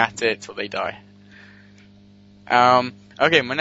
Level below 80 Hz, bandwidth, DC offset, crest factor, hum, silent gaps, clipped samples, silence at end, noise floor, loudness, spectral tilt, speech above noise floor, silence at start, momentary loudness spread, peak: -62 dBFS; 8 kHz; under 0.1%; 22 dB; 50 Hz at -50 dBFS; none; under 0.1%; 0 s; -49 dBFS; -20 LUFS; -4 dB/octave; 30 dB; 0 s; 13 LU; 0 dBFS